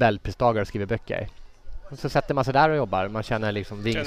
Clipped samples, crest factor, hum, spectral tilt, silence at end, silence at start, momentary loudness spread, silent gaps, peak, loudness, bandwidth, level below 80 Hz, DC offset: under 0.1%; 18 dB; none; -6.5 dB/octave; 0 s; 0 s; 12 LU; none; -6 dBFS; -25 LUFS; 15 kHz; -42 dBFS; 0.2%